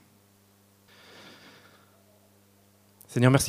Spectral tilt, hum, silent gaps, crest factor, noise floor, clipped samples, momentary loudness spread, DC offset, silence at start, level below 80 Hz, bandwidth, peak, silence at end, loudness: -5.5 dB/octave; 50 Hz at -65 dBFS; none; 26 dB; -61 dBFS; under 0.1%; 31 LU; under 0.1%; 3.1 s; -60 dBFS; 15.5 kHz; -4 dBFS; 0 s; -25 LUFS